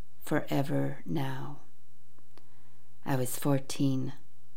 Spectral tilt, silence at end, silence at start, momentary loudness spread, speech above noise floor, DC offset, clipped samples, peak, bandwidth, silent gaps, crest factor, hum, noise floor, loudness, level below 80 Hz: -6 dB/octave; 0.4 s; 0.2 s; 12 LU; 34 dB; 3%; under 0.1%; -14 dBFS; 17.5 kHz; none; 18 dB; none; -65 dBFS; -33 LUFS; -70 dBFS